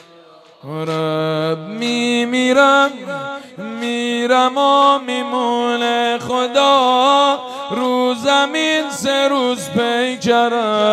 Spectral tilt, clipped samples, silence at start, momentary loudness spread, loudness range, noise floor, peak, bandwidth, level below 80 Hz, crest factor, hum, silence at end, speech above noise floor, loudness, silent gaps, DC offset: -4 dB/octave; under 0.1%; 0.65 s; 11 LU; 2 LU; -44 dBFS; 0 dBFS; 15 kHz; -64 dBFS; 16 dB; none; 0 s; 29 dB; -16 LUFS; none; under 0.1%